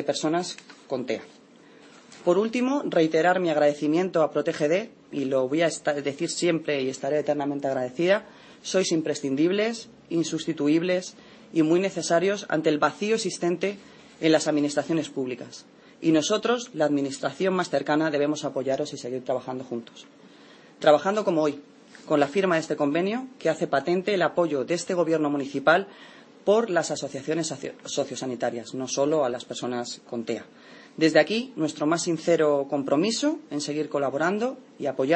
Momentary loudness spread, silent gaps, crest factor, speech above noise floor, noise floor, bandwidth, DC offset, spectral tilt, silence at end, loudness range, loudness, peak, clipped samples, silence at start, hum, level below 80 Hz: 10 LU; none; 20 dB; 27 dB; -52 dBFS; 8.8 kHz; under 0.1%; -4.5 dB/octave; 0 s; 3 LU; -25 LUFS; -6 dBFS; under 0.1%; 0 s; none; -74 dBFS